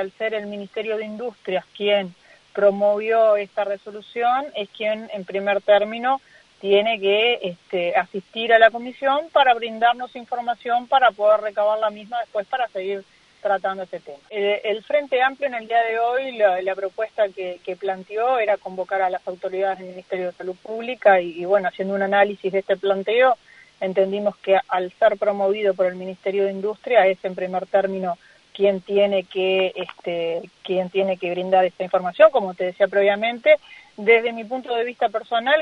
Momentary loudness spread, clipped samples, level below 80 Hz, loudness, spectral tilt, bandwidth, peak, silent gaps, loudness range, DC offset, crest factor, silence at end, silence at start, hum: 11 LU; under 0.1%; -70 dBFS; -21 LUFS; -6 dB/octave; 6.4 kHz; -2 dBFS; none; 4 LU; under 0.1%; 20 dB; 0 s; 0 s; none